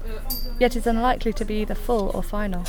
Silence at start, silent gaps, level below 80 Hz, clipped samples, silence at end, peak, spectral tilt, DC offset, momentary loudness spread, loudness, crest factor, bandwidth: 0 s; none; -28 dBFS; under 0.1%; 0 s; -6 dBFS; -5.5 dB/octave; under 0.1%; 8 LU; -25 LUFS; 18 dB; over 20 kHz